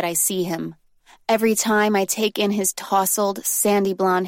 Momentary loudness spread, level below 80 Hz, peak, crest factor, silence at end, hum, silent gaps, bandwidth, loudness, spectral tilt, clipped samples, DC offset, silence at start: 7 LU; -64 dBFS; -6 dBFS; 14 dB; 0 s; none; none; 16.5 kHz; -20 LUFS; -3 dB/octave; under 0.1%; under 0.1%; 0 s